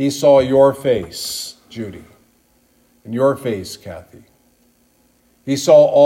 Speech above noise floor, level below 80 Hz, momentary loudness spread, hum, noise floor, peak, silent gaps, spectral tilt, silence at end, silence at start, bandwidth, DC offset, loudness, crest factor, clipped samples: 42 dB; -56 dBFS; 21 LU; none; -57 dBFS; 0 dBFS; none; -5 dB/octave; 0 s; 0 s; 16 kHz; under 0.1%; -16 LUFS; 16 dB; under 0.1%